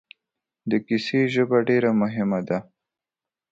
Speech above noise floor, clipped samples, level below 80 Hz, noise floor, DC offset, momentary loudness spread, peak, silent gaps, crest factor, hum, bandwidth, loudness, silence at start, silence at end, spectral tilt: 68 dB; under 0.1%; -66 dBFS; -90 dBFS; under 0.1%; 9 LU; -6 dBFS; none; 18 dB; none; 7.8 kHz; -23 LUFS; 0.65 s; 0.9 s; -7.5 dB/octave